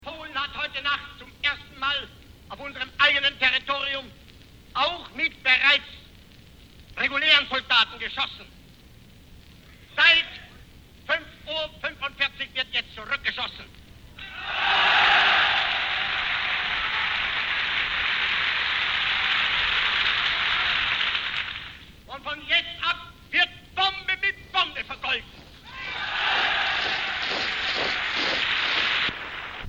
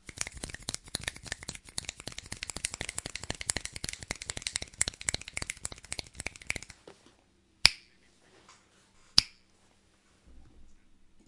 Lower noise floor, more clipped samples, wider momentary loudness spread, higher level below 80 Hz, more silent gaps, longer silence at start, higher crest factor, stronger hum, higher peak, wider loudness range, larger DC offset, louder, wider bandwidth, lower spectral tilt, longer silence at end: second, -50 dBFS vs -66 dBFS; neither; about the same, 15 LU vs 15 LU; about the same, -52 dBFS vs -54 dBFS; neither; about the same, 0 s vs 0.05 s; second, 20 dB vs 38 dB; neither; second, -8 dBFS vs 0 dBFS; about the same, 4 LU vs 6 LU; neither; first, -23 LUFS vs -33 LUFS; first, over 20 kHz vs 12 kHz; first, -2 dB/octave vs -0.5 dB/octave; second, 0 s vs 0.55 s